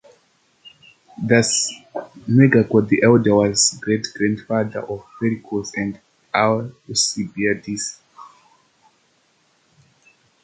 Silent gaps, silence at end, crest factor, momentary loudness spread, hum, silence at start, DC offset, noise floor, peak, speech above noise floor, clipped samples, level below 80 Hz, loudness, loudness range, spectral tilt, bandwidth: none; 2.15 s; 18 dB; 15 LU; none; 0.65 s; under 0.1%; -62 dBFS; -2 dBFS; 43 dB; under 0.1%; -56 dBFS; -19 LUFS; 9 LU; -4.5 dB/octave; 9.6 kHz